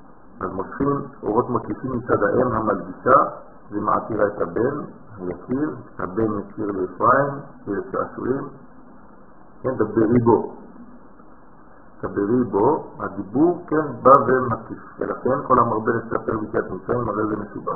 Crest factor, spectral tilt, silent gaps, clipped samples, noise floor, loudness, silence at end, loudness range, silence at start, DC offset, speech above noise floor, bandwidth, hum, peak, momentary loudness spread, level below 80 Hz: 22 dB; -12.5 dB/octave; none; under 0.1%; -48 dBFS; -22 LUFS; 0 s; 5 LU; 0.35 s; 0.6%; 27 dB; 2.6 kHz; none; 0 dBFS; 14 LU; -48 dBFS